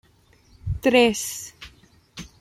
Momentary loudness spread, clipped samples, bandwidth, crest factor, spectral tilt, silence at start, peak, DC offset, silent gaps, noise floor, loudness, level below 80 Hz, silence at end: 26 LU; under 0.1%; 16 kHz; 20 dB; -4 dB/octave; 0.65 s; -4 dBFS; under 0.1%; none; -57 dBFS; -21 LUFS; -44 dBFS; 0.15 s